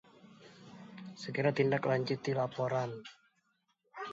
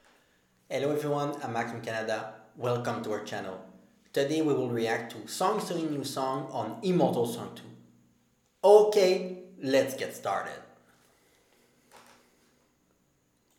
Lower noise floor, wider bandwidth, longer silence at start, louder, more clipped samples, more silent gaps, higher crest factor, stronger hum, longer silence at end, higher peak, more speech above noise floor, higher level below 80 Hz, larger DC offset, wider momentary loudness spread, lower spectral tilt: first, -78 dBFS vs -70 dBFS; second, 7.6 kHz vs 17 kHz; second, 0.25 s vs 0.7 s; second, -34 LUFS vs -29 LUFS; neither; neither; about the same, 20 dB vs 24 dB; neither; second, 0 s vs 1.6 s; second, -16 dBFS vs -6 dBFS; about the same, 44 dB vs 42 dB; about the same, -78 dBFS vs -78 dBFS; neither; first, 23 LU vs 14 LU; about the same, -5.5 dB/octave vs -5.5 dB/octave